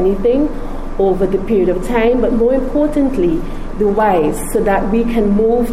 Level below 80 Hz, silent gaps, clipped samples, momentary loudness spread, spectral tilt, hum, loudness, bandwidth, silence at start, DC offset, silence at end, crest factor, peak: -24 dBFS; none; under 0.1%; 5 LU; -7 dB/octave; none; -15 LUFS; 15 kHz; 0 s; under 0.1%; 0 s; 10 dB; -4 dBFS